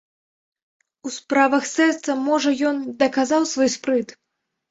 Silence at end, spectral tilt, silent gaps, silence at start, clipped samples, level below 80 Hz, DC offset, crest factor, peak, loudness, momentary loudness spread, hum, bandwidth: 0.6 s; -2.5 dB/octave; none; 1.05 s; under 0.1%; -66 dBFS; under 0.1%; 18 dB; -4 dBFS; -20 LUFS; 12 LU; none; 8 kHz